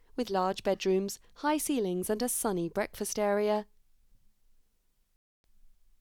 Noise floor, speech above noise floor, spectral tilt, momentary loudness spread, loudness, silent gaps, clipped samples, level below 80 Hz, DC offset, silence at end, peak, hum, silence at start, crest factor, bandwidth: -71 dBFS; 40 dB; -4 dB/octave; 5 LU; -31 LUFS; 5.16-5.44 s; under 0.1%; -60 dBFS; under 0.1%; 0.3 s; -18 dBFS; none; 0.15 s; 16 dB; 19.5 kHz